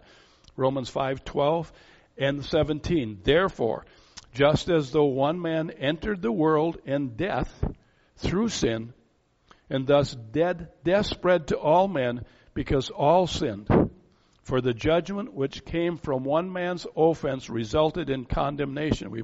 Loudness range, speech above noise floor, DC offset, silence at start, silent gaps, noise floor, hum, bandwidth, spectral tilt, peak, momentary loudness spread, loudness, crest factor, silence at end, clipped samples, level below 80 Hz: 3 LU; 40 dB; under 0.1%; 0.55 s; none; -65 dBFS; none; 8 kHz; -5 dB/octave; -6 dBFS; 8 LU; -26 LUFS; 20 dB; 0 s; under 0.1%; -44 dBFS